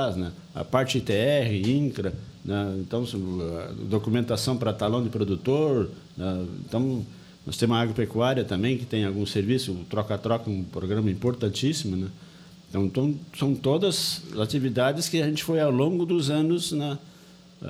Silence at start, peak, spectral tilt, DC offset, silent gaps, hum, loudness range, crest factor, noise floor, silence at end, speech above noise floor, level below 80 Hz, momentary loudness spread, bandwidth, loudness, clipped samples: 0 s; -6 dBFS; -6 dB/octave; under 0.1%; none; none; 3 LU; 20 dB; -51 dBFS; 0 s; 25 dB; -56 dBFS; 9 LU; 15.5 kHz; -26 LUFS; under 0.1%